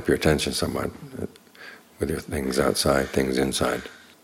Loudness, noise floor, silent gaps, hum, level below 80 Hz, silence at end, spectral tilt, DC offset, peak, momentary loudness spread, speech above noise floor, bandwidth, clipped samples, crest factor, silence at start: -24 LUFS; -46 dBFS; none; none; -44 dBFS; 0.25 s; -4.5 dB/octave; under 0.1%; -6 dBFS; 21 LU; 22 dB; 17 kHz; under 0.1%; 20 dB; 0 s